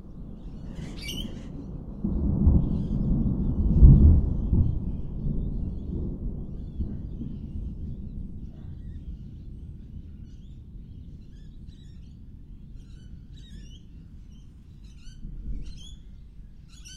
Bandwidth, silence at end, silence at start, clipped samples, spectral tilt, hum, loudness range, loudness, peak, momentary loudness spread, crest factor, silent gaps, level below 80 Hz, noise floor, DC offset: 7 kHz; 0 s; 0.05 s; under 0.1%; -8.5 dB/octave; none; 24 LU; -26 LUFS; -4 dBFS; 25 LU; 24 dB; none; -28 dBFS; -46 dBFS; under 0.1%